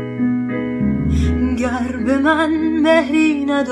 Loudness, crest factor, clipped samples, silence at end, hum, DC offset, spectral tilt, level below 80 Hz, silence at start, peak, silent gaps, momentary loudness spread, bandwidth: -17 LUFS; 16 dB; under 0.1%; 0 s; none; under 0.1%; -7 dB/octave; -30 dBFS; 0 s; -2 dBFS; none; 6 LU; 10.5 kHz